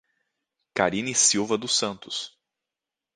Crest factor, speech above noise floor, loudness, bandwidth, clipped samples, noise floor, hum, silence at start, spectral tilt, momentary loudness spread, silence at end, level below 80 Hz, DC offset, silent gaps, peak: 24 dB; 63 dB; -24 LUFS; 10.5 kHz; under 0.1%; -88 dBFS; none; 0.75 s; -1.5 dB/octave; 13 LU; 0.85 s; -64 dBFS; under 0.1%; none; -4 dBFS